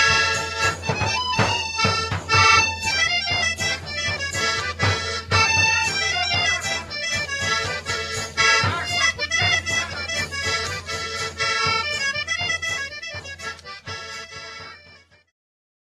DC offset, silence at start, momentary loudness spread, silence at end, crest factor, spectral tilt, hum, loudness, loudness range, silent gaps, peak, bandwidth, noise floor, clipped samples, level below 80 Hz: under 0.1%; 0 s; 15 LU; 1 s; 18 dB; -2 dB/octave; none; -20 LUFS; 6 LU; none; -4 dBFS; 14 kHz; -51 dBFS; under 0.1%; -46 dBFS